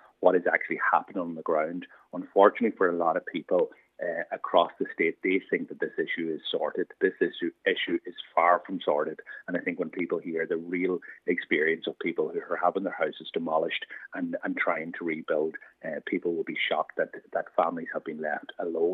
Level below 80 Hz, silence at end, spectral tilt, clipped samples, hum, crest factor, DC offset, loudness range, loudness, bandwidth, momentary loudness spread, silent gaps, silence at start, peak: -88 dBFS; 0 s; -7.5 dB/octave; under 0.1%; none; 24 dB; under 0.1%; 4 LU; -29 LUFS; 4.4 kHz; 9 LU; none; 0.2 s; -4 dBFS